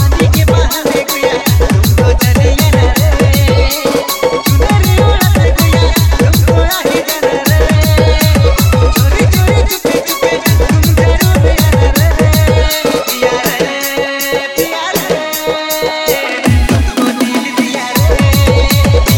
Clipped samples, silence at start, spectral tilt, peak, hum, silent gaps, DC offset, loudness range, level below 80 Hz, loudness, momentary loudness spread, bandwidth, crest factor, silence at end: under 0.1%; 0 s; -5 dB/octave; 0 dBFS; none; none; 0.6%; 3 LU; -16 dBFS; -10 LUFS; 5 LU; 18 kHz; 10 dB; 0 s